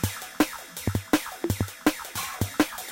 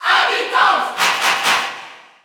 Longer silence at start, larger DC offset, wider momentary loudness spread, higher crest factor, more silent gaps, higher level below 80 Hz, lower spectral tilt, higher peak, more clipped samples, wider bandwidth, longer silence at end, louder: about the same, 0 s vs 0 s; neither; about the same, 5 LU vs 7 LU; first, 22 dB vs 16 dB; neither; first, -46 dBFS vs -72 dBFS; first, -4.5 dB/octave vs 0.5 dB/octave; second, -6 dBFS vs -2 dBFS; neither; second, 17 kHz vs over 20 kHz; second, 0 s vs 0.25 s; second, -28 LUFS vs -15 LUFS